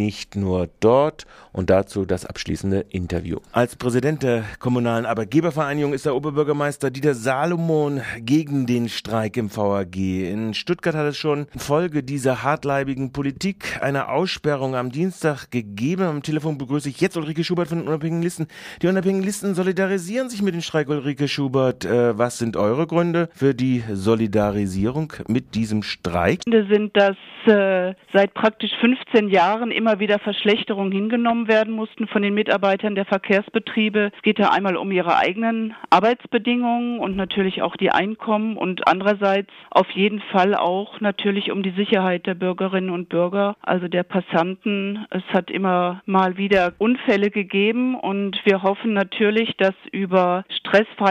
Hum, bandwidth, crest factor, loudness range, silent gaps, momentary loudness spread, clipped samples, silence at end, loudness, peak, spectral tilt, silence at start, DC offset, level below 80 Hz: none; 15.5 kHz; 18 dB; 4 LU; none; 7 LU; under 0.1%; 0 s; -21 LUFS; -2 dBFS; -6 dB/octave; 0 s; under 0.1%; -52 dBFS